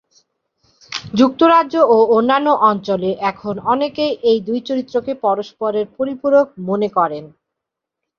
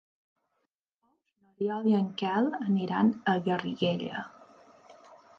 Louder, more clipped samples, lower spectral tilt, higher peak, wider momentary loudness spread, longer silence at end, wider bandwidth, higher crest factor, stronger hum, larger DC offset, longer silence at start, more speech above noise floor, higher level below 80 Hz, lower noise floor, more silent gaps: first, -16 LUFS vs -29 LUFS; neither; second, -6 dB/octave vs -8 dB/octave; first, 0 dBFS vs -14 dBFS; about the same, 9 LU vs 9 LU; first, 0.95 s vs 0.25 s; first, 7.2 kHz vs 6.4 kHz; about the same, 16 dB vs 18 dB; neither; neither; second, 0.9 s vs 1.6 s; first, 66 dB vs 53 dB; first, -58 dBFS vs -76 dBFS; about the same, -82 dBFS vs -81 dBFS; neither